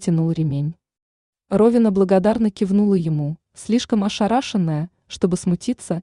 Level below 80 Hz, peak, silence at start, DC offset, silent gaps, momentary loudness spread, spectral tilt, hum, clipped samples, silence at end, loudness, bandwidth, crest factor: -52 dBFS; -4 dBFS; 0 s; under 0.1%; 1.02-1.33 s; 9 LU; -7 dB/octave; none; under 0.1%; 0 s; -20 LUFS; 11 kHz; 14 dB